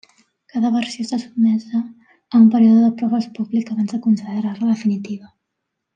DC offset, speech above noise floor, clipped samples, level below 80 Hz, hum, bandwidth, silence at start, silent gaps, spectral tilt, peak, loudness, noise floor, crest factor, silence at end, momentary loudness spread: under 0.1%; 61 dB; under 0.1%; -72 dBFS; none; 8.8 kHz; 0.55 s; none; -7 dB/octave; -2 dBFS; -18 LUFS; -78 dBFS; 16 dB; 0.7 s; 12 LU